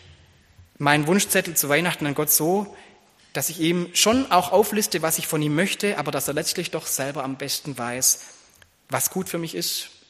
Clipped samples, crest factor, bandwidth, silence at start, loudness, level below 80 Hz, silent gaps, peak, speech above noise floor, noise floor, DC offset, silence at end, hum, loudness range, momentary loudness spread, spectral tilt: under 0.1%; 22 dB; 15.5 kHz; 0.1 s; -22 LUFS; -60 dBFS; none; 0 dBFS; 32 dB; -55 dBFS; under 0.1%; 0.2 s; none; 4 LU; 9 LU; -3 dB/octave